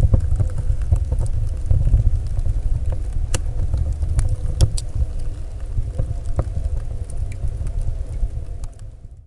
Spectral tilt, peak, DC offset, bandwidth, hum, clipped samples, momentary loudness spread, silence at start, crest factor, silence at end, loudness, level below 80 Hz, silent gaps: -6.5 dB/octave; -4 dBFS; under 0.1%; 11.5 kHz; none; under 0.1%; 11 LU; 0 s; 16 dB; 0.05 s; -24 LUFS; -22 dBFS; none